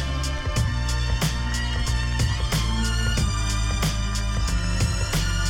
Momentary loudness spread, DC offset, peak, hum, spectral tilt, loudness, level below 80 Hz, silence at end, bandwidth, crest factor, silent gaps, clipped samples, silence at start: 2 LU; under 0.1%; -12 dBFS; none; -4 dB/octave; -25 LUFS; -26 dBFS; 0 s; 16.5 kHz; 12 dB; none; under 0.1%; 0 s